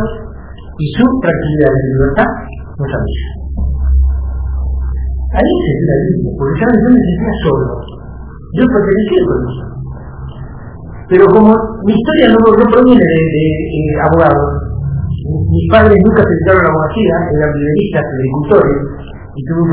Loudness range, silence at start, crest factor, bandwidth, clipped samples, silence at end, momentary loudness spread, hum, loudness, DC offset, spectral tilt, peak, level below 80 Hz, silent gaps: 7 LU; 0 s; 12 dB; 4 kHz; 0.8%; 0 s; 20 LU; none; -11 LUFS; 1%; -12 dB/octave; 0 dBFS; -22 dBFS; none